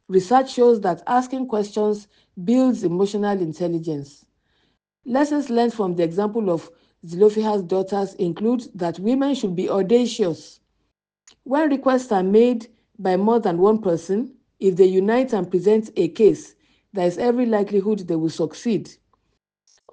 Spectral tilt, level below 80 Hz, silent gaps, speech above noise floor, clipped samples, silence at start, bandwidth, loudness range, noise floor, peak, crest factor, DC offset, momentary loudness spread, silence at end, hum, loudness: -6.5 dB/octave; -64 dBFS; none; 54 dB; under 0.1%; 0.1 s; 9.4 kHz; 4 LU; -74 dBFS; -4 dBFS; 18 dB; under 0.1%; 9 LU; 1 s; none; -20 LUFS